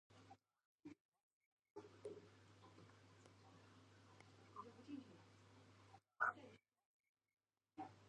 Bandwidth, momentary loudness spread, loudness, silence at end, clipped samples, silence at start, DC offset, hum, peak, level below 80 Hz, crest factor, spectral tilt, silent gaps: 9.6 kHz; 24 LU; -53 LUFS; 0 s; under 0.1%; 0.1 s; under 0.1%; none; -28 dBFS; -88 dBFS; 28 dB; -5 dB/octave; 0.65-0.78 s, 1.01-1.12 s, 1.23-1.57 s, 1.71-1.75 s, 6.86-7.15 s